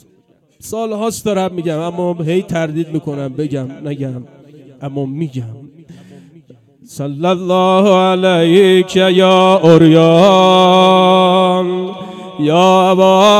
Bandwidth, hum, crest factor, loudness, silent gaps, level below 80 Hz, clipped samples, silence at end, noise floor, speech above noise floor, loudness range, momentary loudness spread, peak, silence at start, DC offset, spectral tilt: 14 kHz; none; 12 dB; -11 LUFS; none; -58 dBFS; 0.5%; 0 s; -53 dBFS; 42 dB; 16 LU; 16 LU; 0 dBFS; 0.65 s; under 0.1%; -6 dB/octave